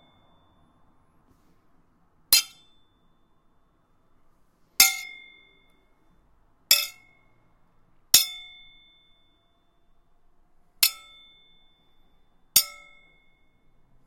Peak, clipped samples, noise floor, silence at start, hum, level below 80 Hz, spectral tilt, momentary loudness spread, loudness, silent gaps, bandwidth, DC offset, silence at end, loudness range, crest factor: 0 dBFS; under 0.1%; -65 dBFS; 2.3 s; none; -64 dBFS; 3 dB/octave; 22 LU; -21 LUFS; none; 16.5 kHz; under 0.1%; 1.35 s; 6 LU; 30 dB